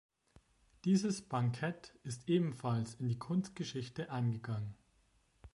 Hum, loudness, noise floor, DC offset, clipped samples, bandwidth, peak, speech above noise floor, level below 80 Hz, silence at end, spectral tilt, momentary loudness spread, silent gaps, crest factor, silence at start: none; -38 LUFS; -73 dBFS; under 0.1%; under 0.1%; 11.5 kHz; -20 dBFS; 36 dB; -68 dBFS; 0.05 s; -6.5 dB/octave; 9 LU; none; 18 dB; 0.85 s